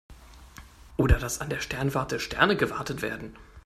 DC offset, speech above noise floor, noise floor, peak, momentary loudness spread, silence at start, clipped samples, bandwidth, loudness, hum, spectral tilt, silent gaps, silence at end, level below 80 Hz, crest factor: under 0.1%; 22 dB; -49 dBFS; -6 dBFS; 12 LU; 0.1 s; under 0.1%; 15.5 kHz; -27 LUFS; none; -5 dB/octave; none; 0.05 s; -36 dBFS; 24 dB